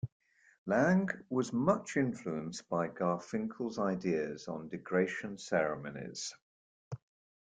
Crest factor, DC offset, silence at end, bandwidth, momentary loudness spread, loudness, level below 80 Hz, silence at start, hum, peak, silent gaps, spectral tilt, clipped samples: 20 dB; under 0.1%; 0.55 s; 9.4 kHz; 12 LU; -35 LUFS; -72 dBFS; 0.05 s; none; -14 dBFS; 0.12-0.20 s, 0.58-0.66 s, 6.42-6.91 s; -6 dB/octave; under 0.1%